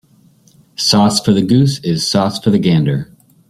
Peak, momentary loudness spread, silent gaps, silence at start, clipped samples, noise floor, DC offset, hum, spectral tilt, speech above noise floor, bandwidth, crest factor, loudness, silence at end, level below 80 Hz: 0 dBFS; 9 LU; none; 0.8 s; under 0.1%; -49 dBFS; under 0.1%; none; -5.5 dB/octave; 37 dB; 15 kHz; 14 dB; -13 LUFS; 0.45 s; -48 dBFS